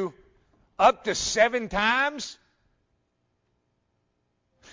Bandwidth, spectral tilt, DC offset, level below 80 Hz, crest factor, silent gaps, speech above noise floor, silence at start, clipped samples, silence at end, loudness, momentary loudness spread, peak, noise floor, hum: 7.6 kHz; -2 dB/octave; under 0.1%; -54 dBFS; 22 dB; none; 51 dB; 0 s; under 0.1%; 2.4 s; -23 LUFS; 14 LU; -6 dBFS; -74 dBFS; 60 Hz at -65 dBFS